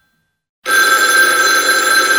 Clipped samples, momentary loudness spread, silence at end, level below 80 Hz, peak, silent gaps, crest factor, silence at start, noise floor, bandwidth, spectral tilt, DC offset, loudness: under 0.1%; 4 LU; 0 s; -62 dBFS; 0 dBFS; none; 12 dB; 0.65 s; -63 dBFS; 18.5 kHz; 1.5 dB/octave; under 0.1%; -10 LUFS